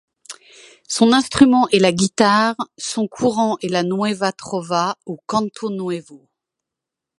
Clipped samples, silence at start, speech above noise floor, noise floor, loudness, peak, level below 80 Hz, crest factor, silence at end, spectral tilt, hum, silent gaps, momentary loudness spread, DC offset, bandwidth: under 0.1%; 0.3 s; 67 dB; -84 dBFS; -18 LUFS; 0 dBFS; -54 dBFS; 20 dB; 1.05 s; -4.5 dB/octave; none; none; 14 LU; under 0.1%; 11.5 kHz